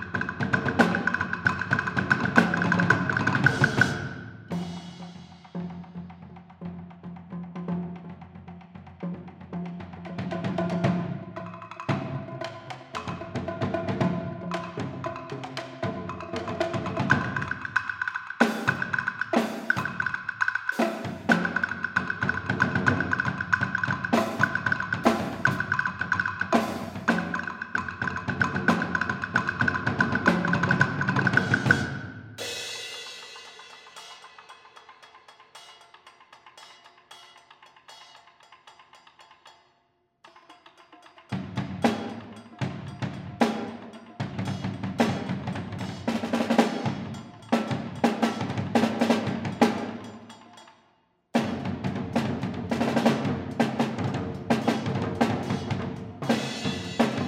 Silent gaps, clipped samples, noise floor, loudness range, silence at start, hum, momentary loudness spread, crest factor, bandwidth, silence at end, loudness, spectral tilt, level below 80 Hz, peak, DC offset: none; under 0.1%; -70 dBFS; 14 LU; 0 s; none; 18 LU; 26 dB; 16 kHz; 0 s; -27 LUFS; -6 dB/octave; -62 dBFS; -2 dBFS; under 0.1%